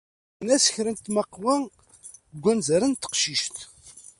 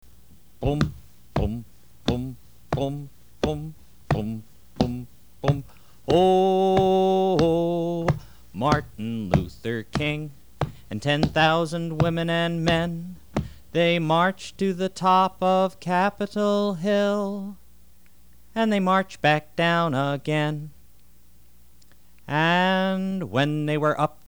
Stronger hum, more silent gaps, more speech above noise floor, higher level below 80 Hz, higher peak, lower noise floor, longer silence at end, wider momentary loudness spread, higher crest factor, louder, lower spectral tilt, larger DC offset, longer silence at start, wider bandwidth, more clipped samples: neither; neither; second, 25 dB vs 34 dB; second, -64 dBFS vs -44 dBFS; second, -8 dBFS vs -4 dBFS; second, -49 dBFS vs -57 dBFS; about the same, 0.2 s vs 0.2 s; first, 19 LU vs 12 LU; about the same, 18 dB vs 22 dB; about the same, -24 LUFS vs -24 LUFS; second, -3 dB/octave vs -6.5 dB/octave; second, under 0.1% vs 0.5%; second, 0.4 s vs 0.6 s; second, 11.5 kHz vs over 20 kHz; neither